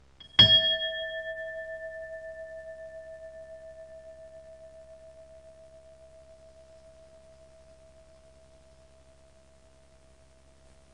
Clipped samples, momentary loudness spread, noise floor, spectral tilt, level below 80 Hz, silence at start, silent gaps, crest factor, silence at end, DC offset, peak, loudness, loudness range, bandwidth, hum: under 0.1%; 31 LU; -59 dBFS; -3.5 dB/octave; -58 dBFS; 0.2 s; none; 28 dB; 4.6 s; under 0.1%; -6 dBFS; -23 LUFS; 30 LU; 10.5 kHz; none